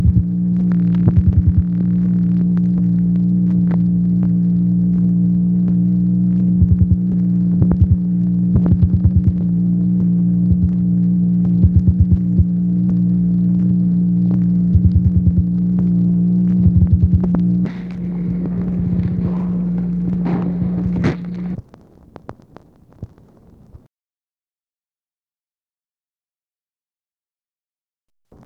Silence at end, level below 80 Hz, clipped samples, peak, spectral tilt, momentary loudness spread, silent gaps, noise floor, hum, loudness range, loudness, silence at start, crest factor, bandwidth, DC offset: 4.7 s; -28 dBFS; under 0.1%; 0 dBFS; -12 dB/octave; 6 LU; none; under -90 dBFS; none; 6 LU; -16 LUFS; 0 s; 14 dB; 2.4 kHz; under 0.1%